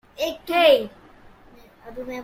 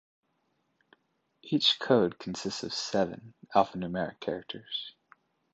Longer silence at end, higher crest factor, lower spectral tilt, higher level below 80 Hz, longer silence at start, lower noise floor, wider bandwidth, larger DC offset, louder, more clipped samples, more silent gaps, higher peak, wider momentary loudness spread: second, 0 s vs 0.65 s; about the same, 20 dB vs 24 dB; second, -3 dB/octave vs -4.5 dB/octave; first, -54 dBFS vs -66 dBFS; second, 0.2 s vs 1.45 s; second, -50 dBFS vs -76 dBFS; first, 16.5 kHz vs 8.8 kHz; neither; first, -20 LUFS vs -30 LUFS; neither; neither; first, -4 dBFS vs -8 dBFS; first, 20 LU vs 12 LU